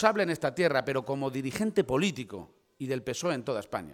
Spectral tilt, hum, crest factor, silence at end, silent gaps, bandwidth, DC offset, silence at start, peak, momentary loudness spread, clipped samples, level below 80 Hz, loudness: -5 dB/octave; none; 24 dB; 0 s; none; 17.5 kHz; under 0.1%; 0 s; -6 dBFS; 11 LU; under 0.1%; -62 dBFS; -30 LUFS